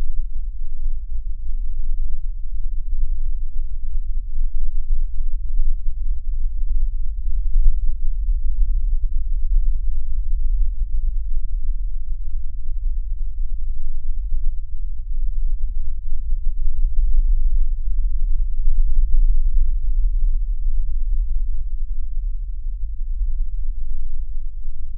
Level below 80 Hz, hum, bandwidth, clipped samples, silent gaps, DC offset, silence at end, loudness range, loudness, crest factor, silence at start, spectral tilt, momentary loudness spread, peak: -18 dBFS; none; 0.2 kHz; under 0.1%; none; under 0.1%; 0 s; 6 LU; -28 LUFS; 14 dB; 0 s; -23 dB/octave; 8 LU; -2 dBFS